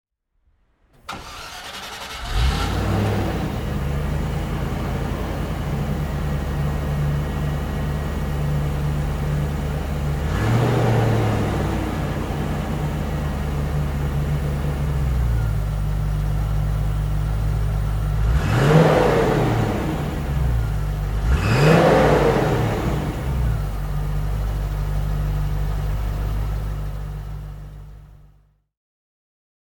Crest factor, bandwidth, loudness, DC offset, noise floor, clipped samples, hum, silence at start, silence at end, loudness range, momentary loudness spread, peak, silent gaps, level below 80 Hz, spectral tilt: 18 dB; 20 kHz; -22 LUFS; under 0.1%; -65 dBFS; under 0.1%; none; 1.1 s; 1.6 s; 7 LU; 10 LU; -2 dBFS; none; -26 dBFS; -7 dB/octave